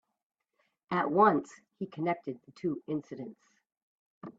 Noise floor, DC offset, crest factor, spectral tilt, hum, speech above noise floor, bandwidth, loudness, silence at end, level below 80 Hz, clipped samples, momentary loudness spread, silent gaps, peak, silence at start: -78 dBFS; under 0.1%; 22 dB; -7.5 dB/octave; none; 46 dB; 8 kHz; -31 LUFS; 0.1 s; -78 dBFS; under 0.1%; 20 LU; 3.77-4.21 s; -12 dBFS; 0.9 s